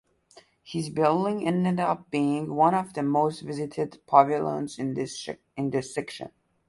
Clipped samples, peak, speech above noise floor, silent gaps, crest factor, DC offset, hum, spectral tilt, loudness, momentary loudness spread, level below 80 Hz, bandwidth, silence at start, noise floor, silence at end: under 0.1%; -4 dBFS; 31 dB; none; 22 dB; under 0.1%; none; -6.5 dB/octave; -26 LUFS; 13 LU; -66 dBFS; 11.5 kHz; 0.65 s; -57 dBFS; 0.4 s